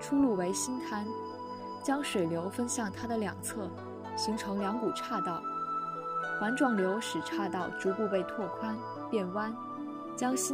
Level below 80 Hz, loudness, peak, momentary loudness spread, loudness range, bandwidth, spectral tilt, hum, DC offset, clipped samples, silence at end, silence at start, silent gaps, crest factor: -70 dBFS; -34 LUFS; -16 dBFS; 11 LU; 2 LU; 16 kHz; -4 dB/octave; none; under 0.1%; under 0.1%; 0 s; 0 s; none; 18 dB